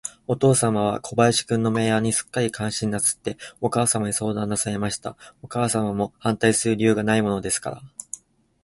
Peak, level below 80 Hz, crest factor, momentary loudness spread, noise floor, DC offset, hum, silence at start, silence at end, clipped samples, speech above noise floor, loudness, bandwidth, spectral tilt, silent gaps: -4 dBFS; -54 dBFS; 18 dB; 12 LU; -42 dBFS; under 0.1%; none; 0.05 s; 0.5 s; under 0.1%; 20 dB; -22 LUFS; 12 kHz; -4.5 dB/octave; none